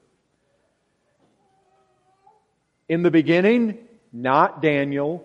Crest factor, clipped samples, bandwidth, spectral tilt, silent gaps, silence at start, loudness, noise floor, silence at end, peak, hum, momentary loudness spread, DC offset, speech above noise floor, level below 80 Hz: 20 dB; under 0.1%; 7.2 kHz; -8 dB/octave; none; 2.9 s; -20 LUFS; -69 dBFS; 0.05 s; -2 dBFS; none; 11 LU; under 0.1%; 50 dB; -70 dBFS